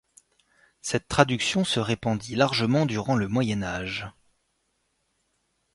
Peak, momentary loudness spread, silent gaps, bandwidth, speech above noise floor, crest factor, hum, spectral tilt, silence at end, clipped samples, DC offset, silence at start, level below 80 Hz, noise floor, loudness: -2 dBFS; 10 LU; none; 11.5 kHz; 49 dB; 26 dB; none; -5 dB/octave; 1.65 s; under 0.1%; under 0.1%; 0.85 s; -54 dBFS; -74 dBFS; -25 LUFS